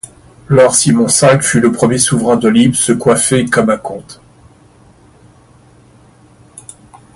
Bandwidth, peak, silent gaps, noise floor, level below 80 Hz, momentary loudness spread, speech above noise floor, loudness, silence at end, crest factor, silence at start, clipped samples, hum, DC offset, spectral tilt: 12 kHz; 0 dBFS; none; -44 dBFS; -46 dBFS; 8 LU; 34 dB; -10 LUFS; 3 s; 14 dB; 0.5 s; under 0.1%; none; under 0.1%; -4.5 dB/octave